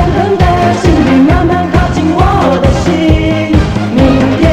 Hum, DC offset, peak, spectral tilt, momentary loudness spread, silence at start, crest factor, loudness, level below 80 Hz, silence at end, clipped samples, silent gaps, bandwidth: none; under 0.1%; 0 dBFS; -7 dB/octave; 3 LU; 0 s; 8 dB; -9 LUFS; -18 dBFS; 0 s; 0.2%; none; 12 kHz